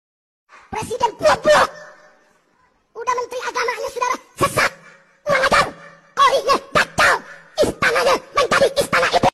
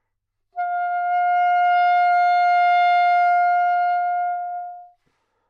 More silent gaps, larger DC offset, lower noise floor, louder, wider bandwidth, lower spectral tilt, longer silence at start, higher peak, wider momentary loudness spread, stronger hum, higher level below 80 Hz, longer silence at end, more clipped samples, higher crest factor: neither; neither; second, -60 dBFS vs -76 dBFS; about the same, -18 LUFS vs -19 LUFS; first, 14 kHz vs 5.2 kHz; first, -3 dB/octave vs 1 dB/octave; first, 0.7 s vs 0.55 s; first, -4 dBFS vs -12 dBFS; about the same, 10 LU vs 12 LU; neither; first, -46 dBFS vs -80 dBFS; second, 0.05 s vs 0.65 s; neither; first, 14 dB vs 8 dB